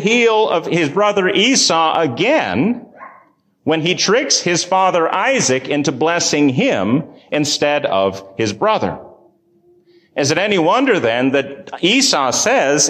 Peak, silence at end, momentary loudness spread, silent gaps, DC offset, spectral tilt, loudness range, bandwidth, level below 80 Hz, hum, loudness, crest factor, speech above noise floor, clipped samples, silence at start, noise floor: -2 dBFS; 0 s; 7 LU; none; under 0.1%; -3 dB/octave; 4 LU; 15 kHz; -56 dBFS; none; -15 LUFS; 14 dB; 38 dB; under 0.1%; 0 s; -53 dBFS